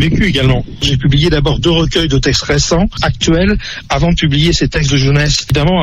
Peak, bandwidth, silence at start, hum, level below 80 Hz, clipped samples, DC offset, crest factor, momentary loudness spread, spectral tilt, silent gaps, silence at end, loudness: 0 dBFS; 11 kHz; 0 s; none; -22 dBFS; under 0.1%; under 0.1%; 10 dB; 4 LU; -5 dB/octave; none; 0 s; -12 LUFS